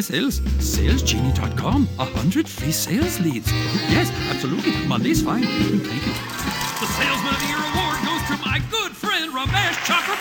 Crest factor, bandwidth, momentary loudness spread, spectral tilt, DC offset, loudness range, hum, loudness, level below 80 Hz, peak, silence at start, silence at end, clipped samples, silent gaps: 18 dB; 18 kHz; 4 LU; -4.5 dB/octave; under 0.1%; 1 LU; none; -21 LUFS; -30 dBFS; -4 dBFS; 0 s; 0 s; under 0.1%; none